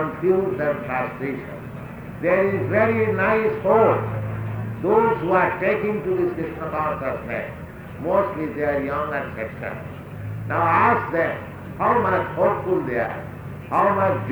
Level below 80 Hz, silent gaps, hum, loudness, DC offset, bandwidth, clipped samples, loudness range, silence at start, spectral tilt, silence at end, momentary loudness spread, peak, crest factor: -50 dBFS; none; none; -22 LUFS; under 0.1%; over 20 kHz; under 0.1%; 5 LU; 0 s; -8.5 dB/octave; 0 s; 14 LU; -4 dBFS; 18 dB